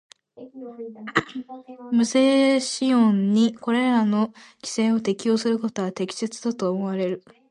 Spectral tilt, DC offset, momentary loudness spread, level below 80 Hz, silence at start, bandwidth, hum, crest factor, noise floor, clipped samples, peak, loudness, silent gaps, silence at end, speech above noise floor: -5 dB/octave; under 0.1%; 18 LU; -68 dBFS; 0.4 s; 11 kHz; none; 18 dB; -44 dBFS; under 0.1%; -6 dBFS; -22 LUFS; none; 0.3 s; 22 dB